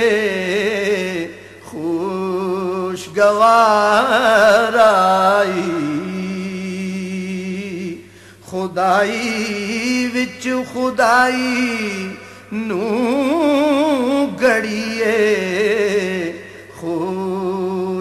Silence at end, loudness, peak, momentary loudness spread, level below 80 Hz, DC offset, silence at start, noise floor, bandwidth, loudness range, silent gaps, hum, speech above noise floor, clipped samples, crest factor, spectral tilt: 0 s; -17 LUFS; -2 dBFS; 14 LU; -58 dBFS; under 0.1%; 0 s; -41 dBFS; 13.5 kHz; 8 LU; none; none; 26 dB; under 0.1%; 14 dB; -4.5 dB/octave